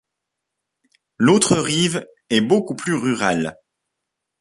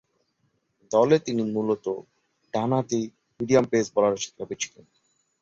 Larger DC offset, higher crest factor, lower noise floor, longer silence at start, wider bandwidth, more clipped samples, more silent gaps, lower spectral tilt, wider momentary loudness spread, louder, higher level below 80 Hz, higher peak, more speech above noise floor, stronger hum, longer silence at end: neither; about the same, 20 dB vs 20 dB; first, -81 dBFS vs -72 dBFS; first, 1.2 s vs 0.9 s; first, 11.5 kHz vs 7.8 kHz; neither; neither; second, -4 dB/octave vs -5.5 dB/octave; second, 8 LU vs 12 LU; first, -19 LUFS vs -25 LUFS; first, -56 dBFS vs -64 dBFS; first, -2 dBFS vs -6 dBFS; first, 63 dB vs 48 dB; neither; about the same, 0.85 s vs 0.75 s